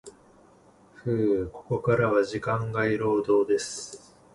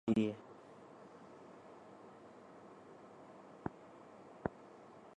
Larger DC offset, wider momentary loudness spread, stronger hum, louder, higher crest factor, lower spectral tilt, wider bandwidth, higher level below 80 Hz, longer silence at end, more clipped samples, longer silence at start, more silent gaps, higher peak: neither; about the same, 13 LU vs 15 LU; neither; first, -26 LUFS vs -47 LUFS; second, 16 dB vs 26 dB; second, -6 dB/octave vs -7.5 dB/octave; first, 11.5 kHz vs 9.6 kHz; first, -56 dBFS vs -72 dBFS; first, 0.4 s vs 0.05 s; neither; about the same, 0.05 s vs 0.05 s; neither; first, -10 dBFS vs -18 dBFS